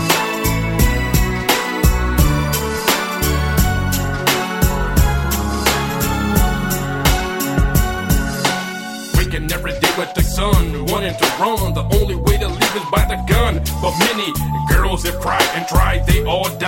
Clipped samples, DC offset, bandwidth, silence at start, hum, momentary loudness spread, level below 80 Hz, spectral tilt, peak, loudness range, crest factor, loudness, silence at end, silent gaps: under 0.1%; under 0.1%; 17 kHz; 0 s; none; 4 LU; -20 dBFS; -4.5 dB/octave; 0 dBFS; 2 LU; 16 dB; -17 LUFS; 0 s; none